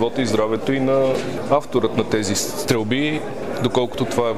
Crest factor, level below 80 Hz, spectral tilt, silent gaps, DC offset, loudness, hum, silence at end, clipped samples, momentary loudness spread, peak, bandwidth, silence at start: 16 dB; -50 dBFS; -5 dB/octave; none; 2%; -20 LUFS; none; 0 s; under 0.1%; 4 LU; -4 dBFS; 19.5 kHz; 0 s